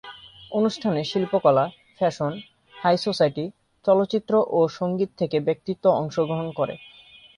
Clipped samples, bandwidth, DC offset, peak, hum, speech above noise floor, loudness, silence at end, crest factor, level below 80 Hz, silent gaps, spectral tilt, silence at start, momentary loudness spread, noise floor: under 0.1%; 10.5 kHz; under 0.1%; -4 dBFS; none; 21 dB; -23 LUFS; 0.55 s; 18 dB; -64 dBFS; none; -6.5 dB/octave; 0.05 s; 9 LU; -43 dBFS